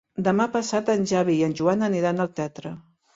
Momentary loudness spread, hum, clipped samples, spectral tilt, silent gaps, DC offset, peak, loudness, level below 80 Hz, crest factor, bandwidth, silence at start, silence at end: 12 LU; none; under 0.1%; -6 dB/octave; none; under 0.1%; -6 dBFS; -23 LUFS; -62 dBFS; 16 dB; 7.8 kHz; 0.2 s; 0.35 s